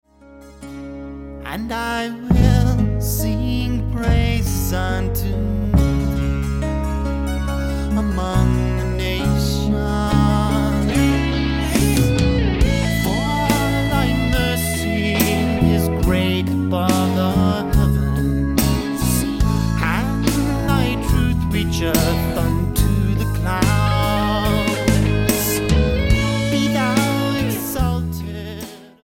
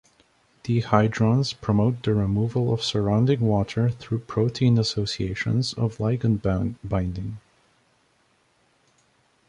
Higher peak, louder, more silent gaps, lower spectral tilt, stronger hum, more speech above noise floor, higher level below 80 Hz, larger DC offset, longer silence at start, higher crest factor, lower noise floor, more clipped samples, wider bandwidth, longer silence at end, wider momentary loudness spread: about the same, 0 dBFS vs -2 dBFS; first, -19 LUFS vs -24 LUFS; neither; second, -5.5 dB/octave vs -7 dB/octave; neither; second, 24 dB vs 42 dB; first, -24 dBFS vs -46 dBFS; neither; second, 0.3 s vs 0.65 s; about the same, 18 dB vs 22 dB; second, -43 dBFS vs -65 dBFS; neither; first, 17 kHz vs 10 kHz; second, 0.2 s vs 2.1 s; about the same, 6 LU vs 7 LU